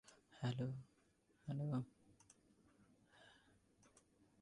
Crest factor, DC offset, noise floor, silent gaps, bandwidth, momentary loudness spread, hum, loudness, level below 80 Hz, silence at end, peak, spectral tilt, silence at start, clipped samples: 18 dB; under 0.1%; -78 dBFS; none; 11 kHz; 24 LU; none; -47 LUFS; -80 dBFS; 1.1 s; -32 dBFS; -7.5 dB/octave; 0.1 s; under 0.1%